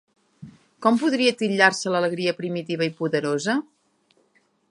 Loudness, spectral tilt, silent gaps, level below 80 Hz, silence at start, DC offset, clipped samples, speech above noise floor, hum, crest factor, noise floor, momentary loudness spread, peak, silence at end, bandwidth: -22 LUFS; -4.5 dB/octave; none; -74 dBFS; 0.4 s; under 0.1%; under 0.1%; 43 dB; none; 22 dB; -65 dBFS; 8 LU; -2 dBFS; 1.1 s; 11.5 kHz